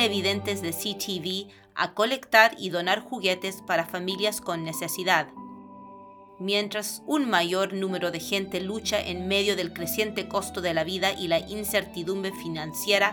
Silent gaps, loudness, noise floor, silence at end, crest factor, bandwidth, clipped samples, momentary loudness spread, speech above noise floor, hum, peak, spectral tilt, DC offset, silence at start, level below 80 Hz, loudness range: none; -26 LUFS; -48 dBFS; 0 s; 26 dB; over 20 kHz; under 0.1%; 9 LU; 21 dB; none; -2 dBFS; -3 dB/octave; under 0.1%; 0 s; -62 dBFS; 4 LU